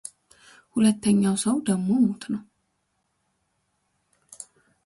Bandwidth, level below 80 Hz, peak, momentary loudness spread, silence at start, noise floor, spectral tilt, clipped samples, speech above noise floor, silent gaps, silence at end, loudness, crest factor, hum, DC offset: 11.5 kHz; -64 dBFS; -10 dBFS; 22 LU; 0.75 s; -74 dBFS; -5.5 dB/octave; under 0.1%; 52 dB; none; 0.45 s; -23 LUFS; 16 dB; none; under 0.1%